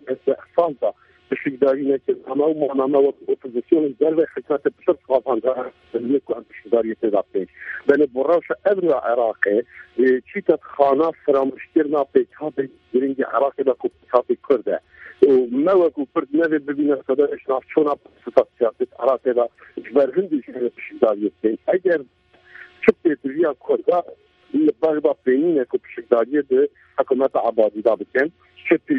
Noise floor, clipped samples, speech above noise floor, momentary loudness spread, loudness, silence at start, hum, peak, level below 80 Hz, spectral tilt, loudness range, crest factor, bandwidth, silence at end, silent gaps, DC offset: -45 dBFS; under 0.1%; 25 dB; 8 LU; -20 LUFS; 0.05 s; none; 0 dBFS; -64 dBFS; -8.5 dB/octave; 2 LU; 20 dB; 5.2 kHz; 0 s; none; under 0.1%